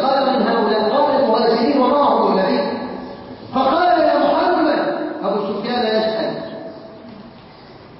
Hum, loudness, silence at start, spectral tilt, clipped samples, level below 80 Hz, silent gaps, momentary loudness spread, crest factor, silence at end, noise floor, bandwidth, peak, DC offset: none; -17 LUFS; 0 s; -10 dB/octave; under 0.1%; -54 dBFS; none; 18 LU; 14 dB; 0 s; -40 dBFS; 5.8 kHz; -4 dBFS; under 0.1%